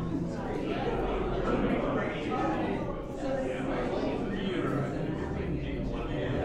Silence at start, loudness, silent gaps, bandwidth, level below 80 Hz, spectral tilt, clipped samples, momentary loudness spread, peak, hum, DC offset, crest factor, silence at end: 0 s; -32 LUFS; none; 11.5 kHz; -42 dBFS; -7.5 dB/octave; under 0.1%; 5 LU; -18 dBFS; none; under 0.1%; 14 dB; 0 s